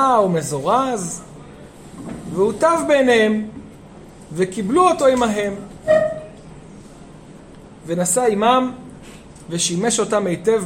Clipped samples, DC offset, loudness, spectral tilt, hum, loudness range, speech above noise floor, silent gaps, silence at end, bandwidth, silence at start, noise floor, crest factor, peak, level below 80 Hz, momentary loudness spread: under 0.1%; under 0.1%; -18 LUFS; -4 dB/octave; none; 4 LU; 23 dB; none; 0 s; 16.5 kHz; 0 s; -41 dBFS; 18 dB; -2 dBFS; -50 dBFS; 23 LU